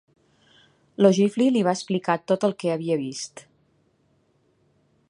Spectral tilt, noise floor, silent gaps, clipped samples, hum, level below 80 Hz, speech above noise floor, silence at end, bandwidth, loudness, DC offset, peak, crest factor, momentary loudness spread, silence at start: -6 dB/octave; -65 dBFS; none; under 0.1%; none; -74 dBFS; 43 dB; 1.7 s; 11 kHz; -23 LUFS; under 0.1%; -4 dBFS; 22 dB; 14 LU; 1 s